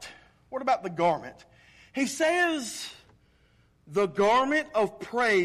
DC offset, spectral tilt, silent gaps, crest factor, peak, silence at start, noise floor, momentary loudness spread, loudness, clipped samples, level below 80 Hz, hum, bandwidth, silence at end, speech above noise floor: under 0.1%; -4 dB/octave; none; 14 dB; -14 dBFS; 0 s; -63 dBFS; 15 LU; -27 LUFS; under 0.1%; -64 dBFS; none; 14.5 kHz; 0 s; 37 dB